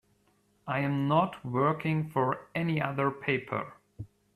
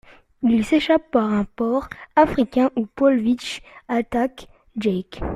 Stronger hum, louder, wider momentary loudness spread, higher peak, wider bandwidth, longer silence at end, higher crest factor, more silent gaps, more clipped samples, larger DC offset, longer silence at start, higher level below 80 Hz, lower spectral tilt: neither; second, -30 LUFS vs -21 LUFS; first, 19 LU vs 8 LU; second, -14 dBFS vs -4 dBFS; about the same, 13.5 kHz vs 12.5 kHz; first, 0.3 s vs 0 s; about the same, 18 dB vs 18 dB; neither; neither; neither; first, 0.65 s vs 0.4 s; second, -66 dBFS vs -44 dBFS; first, -8.5 dB/octave vs -6 dB/octave